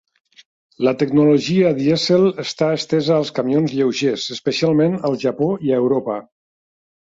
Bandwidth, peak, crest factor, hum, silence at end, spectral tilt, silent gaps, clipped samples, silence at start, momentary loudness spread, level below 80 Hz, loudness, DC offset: 7.8 kHz; -4 dBFS; 14 dB; none; 0.8 s; -6 dB/octave; none; under 0.1%; 0.8 s; 6 LU; -60 dBFS; -18 LUFS; under 0.1%